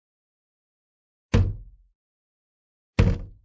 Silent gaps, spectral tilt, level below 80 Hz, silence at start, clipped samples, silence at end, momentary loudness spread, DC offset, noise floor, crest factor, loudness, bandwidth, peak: 1.95-2.93 s; -7.5 dB/octave; -32 dBFS; 1.35 s; under 0.1%; 0.15 s; 7 LU; under 0.1%; under -90 dBFS; 22 dB; -25 LUFS; 7.8 kHz; -6 dBFS